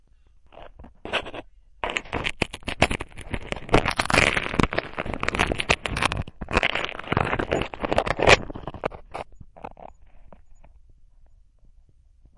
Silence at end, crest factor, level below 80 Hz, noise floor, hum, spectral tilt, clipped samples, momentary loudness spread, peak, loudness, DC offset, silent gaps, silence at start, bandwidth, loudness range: 1.45 s; 22 dB; -38 dBFS; -54 dBFS; none; -4 dB/octave; under 0.1%; 19 LU; -4 dBFS; -24 LUFS; under 0.1%; none; 0.55 s; 11.5 kHz; 6 LU